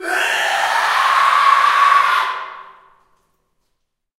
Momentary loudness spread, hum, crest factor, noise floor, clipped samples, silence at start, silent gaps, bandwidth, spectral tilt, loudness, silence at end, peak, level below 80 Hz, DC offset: 9 LU; none; 16 dB; -71 dBFS; under 0.1%; 0 s; none; 16 kHz; 1 dB/octave; -14 LUFS; 1.55 s; -2 dBFS; -66 dBFS; under 0.1%